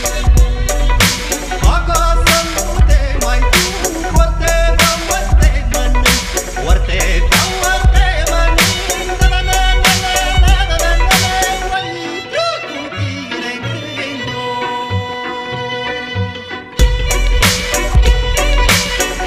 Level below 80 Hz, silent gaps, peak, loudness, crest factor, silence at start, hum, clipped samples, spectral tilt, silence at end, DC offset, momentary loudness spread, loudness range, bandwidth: -16 dBFS; none; 0 dBFS; -14 LUFS; 12 dB; 0 s; none; under 0.1%; -3 dB/octave; 0 s; under 0.1%; 9 LU; 7 LU; 16 kHz